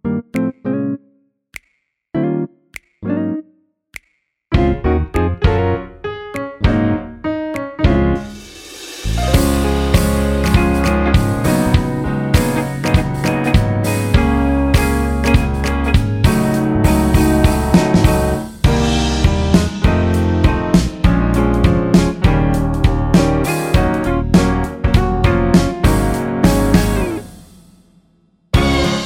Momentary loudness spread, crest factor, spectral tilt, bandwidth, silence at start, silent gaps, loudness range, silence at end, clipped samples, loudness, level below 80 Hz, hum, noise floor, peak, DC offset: 11 LU; 14 dB; -6.5 dB/octave; 17 kHz; 0.05 s; none; 5 LU; 0 s; under 0.1%; -15 LUFS; -22 dBFS; none; -66 dBFS; 0 dBFS; under 0.1%